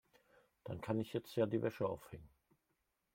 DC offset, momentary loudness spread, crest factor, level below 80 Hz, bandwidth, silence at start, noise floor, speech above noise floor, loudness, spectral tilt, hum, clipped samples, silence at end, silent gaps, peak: under 0.1%; 19 LU; 20 dB; -72 dBFS; 16.5 kHz; 0.65 s; -85 dBFS; 44 dB; -41 LUFS; -7.5 dB/octave; none; under 0.1%; 0.9 s; none; -22 dBFS